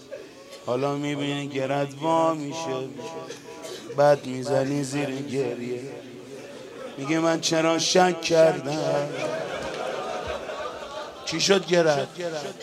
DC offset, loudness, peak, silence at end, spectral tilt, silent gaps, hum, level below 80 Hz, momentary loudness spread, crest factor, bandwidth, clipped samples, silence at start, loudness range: under 0.1%; -25 LUFS; -4 dBFS; 0 s; -4 dB/octave; none; none; -62 dBFS; 18 LU; 20 dB; 14.5 kHz; under 0.1%; 0 s; 4 LU